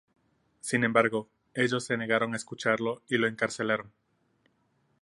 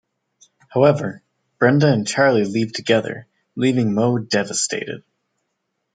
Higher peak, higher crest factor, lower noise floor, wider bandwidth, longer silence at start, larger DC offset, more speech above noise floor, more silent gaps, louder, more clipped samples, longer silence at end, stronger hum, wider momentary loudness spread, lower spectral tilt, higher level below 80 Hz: second, -6 dBFS vs -2 dBFS; first, 24 dB vs 18 dB; about the same, -72 dBFS vs -75 dBFS; first, 11.5 kHz vs 9.6 kHz; about the same, 0.65 s vs 0.7 s; neither; second, 43 dB vs 57 dB; neither; second, -28 LUFS vs -18 LUFS; neither; first, 1.15 s vs 0.95 s; neither; second, 8 LU vs 14 LU; about the same, -4.5 dB/octave vs -5 dB/octave; second, -74 dBFS vs -62 dBFS